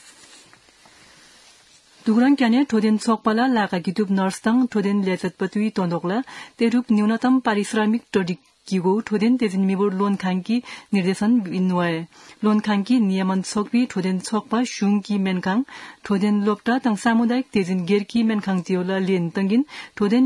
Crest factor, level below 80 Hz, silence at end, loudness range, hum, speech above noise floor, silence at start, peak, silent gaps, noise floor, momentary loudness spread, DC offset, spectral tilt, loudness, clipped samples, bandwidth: 16 dB; -66 dBFS; 0 s; 2 LU; none; 32 dB; 2.05 s; -4 dBFS; none; -52 dBFS; 6 LU; under 0.1%; -6.5 dB/octave; -21 LUFS; under 0.1%; 12 kHz